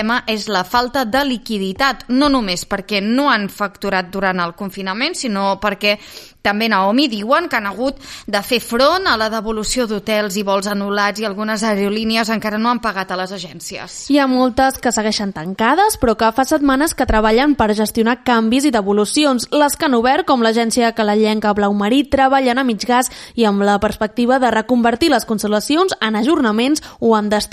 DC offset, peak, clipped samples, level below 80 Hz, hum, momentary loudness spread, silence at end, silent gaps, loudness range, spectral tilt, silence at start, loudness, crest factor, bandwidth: under 0.1%; 0 dBFS; under 0.1%; -40 dBFS; none; 7 LU; 0.05 s; none; 3 LU; -4 dB/octave; 0 s; -16 LUFS; 16 dB; 15.5 kHz